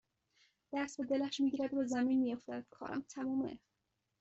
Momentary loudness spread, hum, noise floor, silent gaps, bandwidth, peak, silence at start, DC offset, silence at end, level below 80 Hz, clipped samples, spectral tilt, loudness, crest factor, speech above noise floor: 11 LU; none; -74 dBFS; none; 8.2 kHz; -24 dBFS; 0.7 s; under 0.1%; 0.65 s; -76 dBFS; under 0.1%; -4.5 dB/octave; -38 LUFS; 14 dB; 38 dB